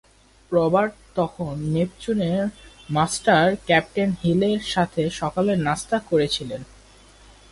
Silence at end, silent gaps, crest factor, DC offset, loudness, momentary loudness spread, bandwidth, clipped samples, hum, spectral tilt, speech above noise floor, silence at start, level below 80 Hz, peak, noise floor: 0.9 s; none; 18 dB; under 0.1%; -22 LUFS; 8 LU; 11.5 kHz; under 0.1%; none; -5.5 dB/octave; 28 dB; 0.5 s; -50 dBFS; -4 dBFS; -50 dBFS